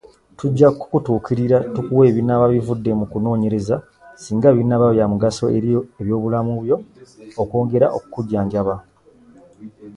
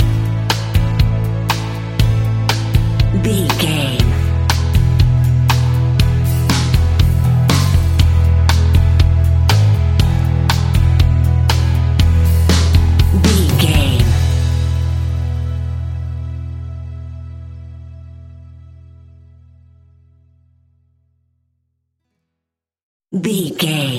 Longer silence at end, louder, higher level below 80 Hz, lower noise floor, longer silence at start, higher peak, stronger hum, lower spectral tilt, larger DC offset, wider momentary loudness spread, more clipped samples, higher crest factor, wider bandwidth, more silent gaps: about the same, 0 s vs 0 s; second, -18 LUFS vs -14 LUFS; second, -48 dBFS vs -20 dBFS; second, -49 dBFS vs -81 dBFS; first, 0.4 s vs 0 s; about the same, 0 dBFS vs 0 dBFS; neither; first, -8.5 dB/octave vs -5.5 dB/octave; neither; about the same, 10 LU vs 12 LU; neither; about the same, 18 dB vs 14 dB; second, 11 kHz vs 16.5 kHz; second, none vs 22.83-23.00 s